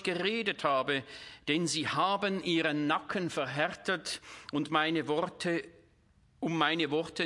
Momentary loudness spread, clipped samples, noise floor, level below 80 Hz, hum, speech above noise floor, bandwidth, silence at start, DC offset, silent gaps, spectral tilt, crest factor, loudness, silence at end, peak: 8 LU; under 0.1%; -66 dBFS; -72 dBFS; none; 34 dB; 11.5 kHz; 0 s; under 0.1%; none; -4 dB/octave; 20 dB; -32 LUFS; 0 s; -12 dBFS